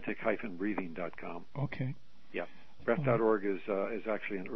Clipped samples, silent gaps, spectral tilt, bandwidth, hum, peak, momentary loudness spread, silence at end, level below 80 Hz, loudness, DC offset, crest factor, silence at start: under 0.1%; none; -9.5 dB/octave; 6.2 kHz; none; -16 dBFS; 14 LU; 0 s; -68 dBFS; -35 LUFS; 0.7%; 20 dB; 0 s